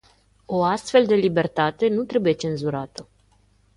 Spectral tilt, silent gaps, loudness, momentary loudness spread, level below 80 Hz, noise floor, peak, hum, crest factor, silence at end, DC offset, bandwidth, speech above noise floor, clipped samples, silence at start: -6 dB/octave; none; -22 LUFS; 11 LU; -58 dBFS; -60 dBFS; -4 dBFS; 50 Hz at -50 dBFS; 18 dB; 0.75 s; under 0.1%; 11.5 kHz; 39 dB; under 0.1%; 0.5 s